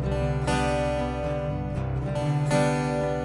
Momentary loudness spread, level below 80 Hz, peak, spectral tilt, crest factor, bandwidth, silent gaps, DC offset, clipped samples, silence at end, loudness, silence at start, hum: 6 LU; -36 dBFS; -8 dBFS; -6.5 dB/octave; 16 dB; 11.5 kHz; none; under 0.1%; under 0.1%; 0 s; -26 LUFS; 0 s; none